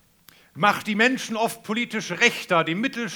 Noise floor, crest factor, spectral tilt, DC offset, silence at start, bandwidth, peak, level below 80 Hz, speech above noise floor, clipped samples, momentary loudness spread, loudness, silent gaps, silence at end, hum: -55 dBFS; 22 dB; -3.5 dB/octave; under 0.1%; 0.55 s; over 20 kHz; -2 dBFS; -72 dBFS; 32 dB; under 0.1%; 6 LU; -22 LUFS; none; 0 s; none